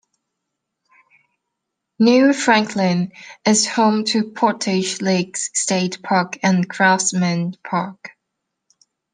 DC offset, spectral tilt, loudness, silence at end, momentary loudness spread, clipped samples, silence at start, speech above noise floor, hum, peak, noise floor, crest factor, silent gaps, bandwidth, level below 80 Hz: under 0.1%; -4 dB/octave; -18 LUFS; 1.05 s; 10 LU; under 0.1%; 2 s; 61 dB; none; -2 dBFS; -79 dBFS; 18 dB; none; 10 kHz; -68 dBFS